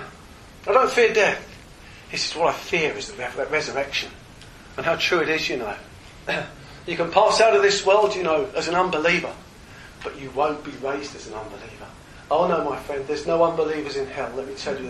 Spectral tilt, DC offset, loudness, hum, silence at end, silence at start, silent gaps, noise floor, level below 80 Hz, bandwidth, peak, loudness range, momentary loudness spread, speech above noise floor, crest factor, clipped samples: -3.5 dB/octave; under 0.1%; -22 LUFS; none; 0 s; 0 s; none; -44 dBFS; -50 dBFS; 13 kHz; -2 dBFS; 7 LU; 19 LU; 22 dB; 22 dB; under 0.1%